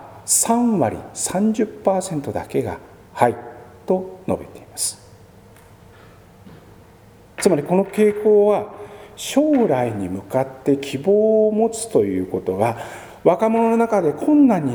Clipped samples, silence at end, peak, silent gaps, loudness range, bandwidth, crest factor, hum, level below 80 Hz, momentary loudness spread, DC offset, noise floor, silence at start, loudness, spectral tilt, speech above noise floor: under 0.1%; 0 s; 0 dBFS; none; 9 LU; over 20 kHz; 20 dB; none; -56 dBFS; 15 LU; under 0.1%; -47 dBFS; 0 s; -19 LUFS; -5 dB/octave; 29 dB